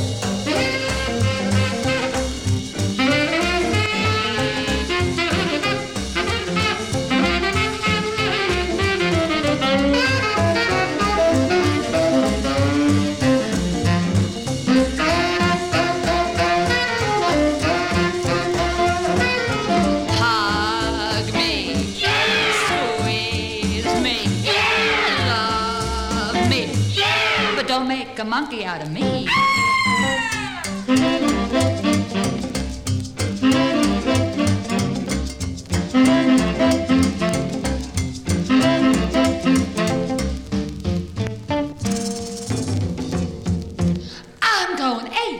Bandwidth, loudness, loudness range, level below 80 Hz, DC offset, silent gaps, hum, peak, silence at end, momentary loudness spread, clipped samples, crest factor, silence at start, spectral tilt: 17 kHz; -19 LUFS; 3 LU; -36 dBFS; under 0.1%; none; none; -6 dBFS; 0 s; 8 LU; under 0.1%; 14 dB; 0 s; -4.5 dB/octave